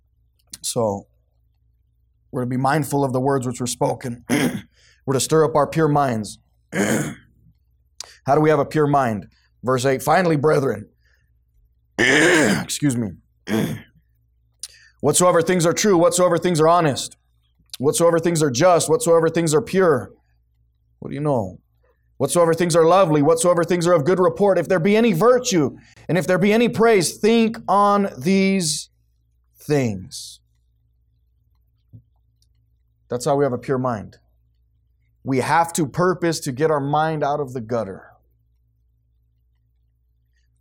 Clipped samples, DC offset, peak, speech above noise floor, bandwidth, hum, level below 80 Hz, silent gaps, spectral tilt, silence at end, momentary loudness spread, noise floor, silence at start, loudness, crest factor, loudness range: under 0.1%; under 0.1%; -4 dBFS; 45 dB; 17.5 kHz; none; -56 dBFS; none; -5 dB/octave; 2.65 s; 16 LU; -63 dBFS; 0.55 s; -19 LUFS; 16 dB; 9 LU